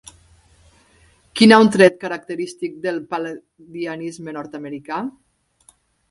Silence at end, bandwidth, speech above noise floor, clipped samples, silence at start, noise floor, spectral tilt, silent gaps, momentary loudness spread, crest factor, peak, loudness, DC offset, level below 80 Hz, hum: 1 s; 11.5 kHz; 38 dB; under 0.1%; 1.35 s; -56 dBFS; -5 dB/octave; none; 21 LU; 20 dB; 0 dBFS; -18 LUFS; under 0.1%; -60 dBFS; none